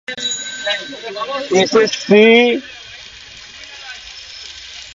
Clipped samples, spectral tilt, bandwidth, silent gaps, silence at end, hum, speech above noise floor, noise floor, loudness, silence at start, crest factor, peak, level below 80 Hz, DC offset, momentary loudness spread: under 0.1%; -3.5 dB/octave; 7.8 kHz; none; 0 s; none; 23 dB; -37 dBFS; -14 LUFS; 0.1 s; 18 dB; 0 dBFS; -56 dBFS; under 0.1%; 23 LU